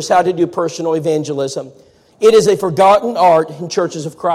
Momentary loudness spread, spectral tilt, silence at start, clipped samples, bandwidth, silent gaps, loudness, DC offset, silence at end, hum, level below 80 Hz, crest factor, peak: 10 LU; -5 dB/octave; 0 s; under 0.1%; 15 kHz; none; -14 LUFS; under 0.1%; 0 s; none; -56 dBFS; 12 dB; -2 dBFS